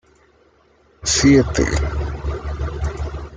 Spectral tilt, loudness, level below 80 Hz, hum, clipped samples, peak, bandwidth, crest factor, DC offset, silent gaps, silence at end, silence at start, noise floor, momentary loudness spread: -4.5 dB/octave; -19 LUFS; -28 dBFS; none; under 0.1%; -2 dBFS; 9.6 kHz; 18 dB; under 0.1%; none; 0 s; 1 s; -55 dBFS; 14 LU